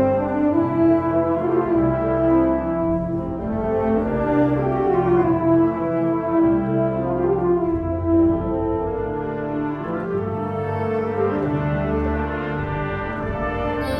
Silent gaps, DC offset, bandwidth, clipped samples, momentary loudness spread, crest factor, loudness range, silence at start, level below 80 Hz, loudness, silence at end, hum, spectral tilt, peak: none; under 0.1%; 5.2 kHz; under 0.1%; 7 LU; 14 dB; 4 LU; 0 s; -36 dBFS; -21 LUFS; 0 s; none; -10 dB/octave; -6 dBFS